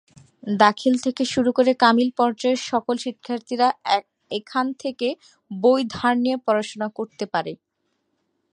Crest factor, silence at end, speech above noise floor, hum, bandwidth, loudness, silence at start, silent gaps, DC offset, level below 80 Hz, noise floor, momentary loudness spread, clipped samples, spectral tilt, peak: 22 dB; 1 s; 52 dB; none; 10.5 kHz; -22 LUFS; 0.45 s; none; under 0.1%; -64 dBFS; -73 dBFS; 13 LU; under 0.1%; -4.5 dB/octave; 0 dBFS